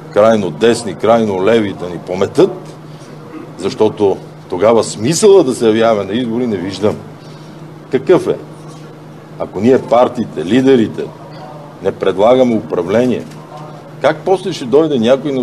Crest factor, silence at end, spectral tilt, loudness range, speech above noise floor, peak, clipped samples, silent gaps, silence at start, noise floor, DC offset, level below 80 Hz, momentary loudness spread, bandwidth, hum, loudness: 14 dB; 0 s; -5.5 dB/octave; 4 LU; 21 dB; 0 dBFS; under 0.1%; none; 0 s; -33 dBFS; 0.2%; -54 dBFS; 22 LU; 12.5 kHz; none; -13 LUFS